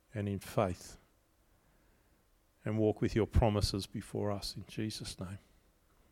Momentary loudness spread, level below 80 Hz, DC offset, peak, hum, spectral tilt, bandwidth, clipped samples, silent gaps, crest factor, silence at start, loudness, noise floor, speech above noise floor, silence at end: 15 LU; -46 dBFS; under 0.1%; -14 dBFS; none; -6 dB/octave; 16.5 kHz; under 0.1%; none; 22 dB; 0.15 s; -35 LUFS; -70 dBFS; 36 dB; 0.75 s